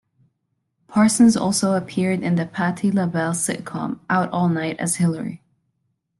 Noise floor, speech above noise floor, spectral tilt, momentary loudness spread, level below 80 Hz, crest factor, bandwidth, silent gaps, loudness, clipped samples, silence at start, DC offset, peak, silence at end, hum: -73 dBFS; 54 dB; -5 dB/octave; 10 LU; -60 dBFS; 16 dB; 12.5 kHz; none; -20 LUFS; under 0.1%; 0.9 s; under 0.1%; -4 dBFS; 0.85 s; none